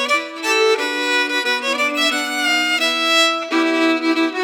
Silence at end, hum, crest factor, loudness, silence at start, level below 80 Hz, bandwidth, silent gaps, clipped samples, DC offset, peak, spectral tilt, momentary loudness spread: 0 s; none; 14 dB; -16 LUFS; 0 s; -86 dBFS; 19 kHz; none; under 0.1%; under 0.1%; -4 dBFS; 0.5 dB/octave; 4 LU